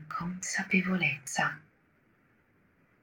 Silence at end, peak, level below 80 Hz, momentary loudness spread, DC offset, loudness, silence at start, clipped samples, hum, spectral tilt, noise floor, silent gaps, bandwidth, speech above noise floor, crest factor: 1.4 s; -12 dBFS; -68 dBFS; 9 LU; under 0.1%; -30 LUFS; 0 s; under 0.1%; none; -4 dB/octave; -68 dBFS; none; 18 kHz; 37 dB; 22 dB